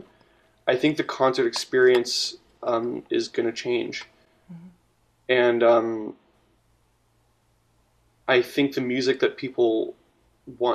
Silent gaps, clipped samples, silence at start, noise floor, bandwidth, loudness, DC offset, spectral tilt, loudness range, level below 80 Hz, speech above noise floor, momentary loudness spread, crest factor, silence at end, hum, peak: none; under 0.1%; 0.65 s; -65 dBFS; 14 kHz; -23 LUFS; under 0.1%; -4 dB/octave; 5 LU; -68 dBFS; 43 dB; 14 LU; 20 dB; 0 s; none; -6 dBFS